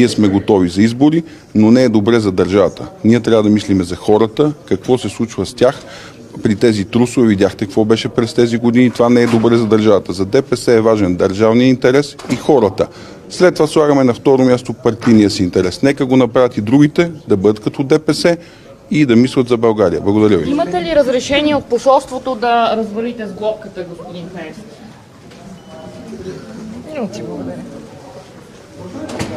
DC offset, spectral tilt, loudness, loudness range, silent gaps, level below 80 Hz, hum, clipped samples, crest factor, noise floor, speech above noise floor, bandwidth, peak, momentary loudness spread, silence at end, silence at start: under 0.1%; -6.5 dB/octave; -13 LUFS; 16 LU; none; -46 dBFS; none; under 0.1%; 14 dB; -38 dBFS; 25 dB; 13 kHz; 0 dBFS; 18 LU; 0 s; 0 s